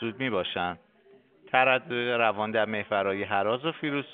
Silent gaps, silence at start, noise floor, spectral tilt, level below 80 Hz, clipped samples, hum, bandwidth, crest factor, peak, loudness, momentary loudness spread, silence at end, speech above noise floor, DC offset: none; 0 s; -59 dBFS; -2.5 dB/octave; -70 dBFS; under 0.1%; none; 4.6 kHz; 22 dB; -6 dBFS; -27 LUFS; 8 LU; 0 s; 31 dB; under 0.1%